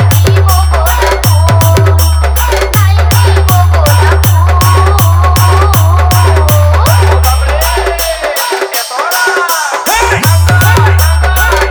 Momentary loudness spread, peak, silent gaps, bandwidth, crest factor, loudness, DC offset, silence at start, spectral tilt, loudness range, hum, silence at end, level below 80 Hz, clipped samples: 4 LU; 0 dBFS; none; over 20 kHz; 6 dB; -8 LUFS; under 0.1%; 0 s; -4.5 dB/octave; 3 LU; none; 0 s; -14 dBFS; under 0.1%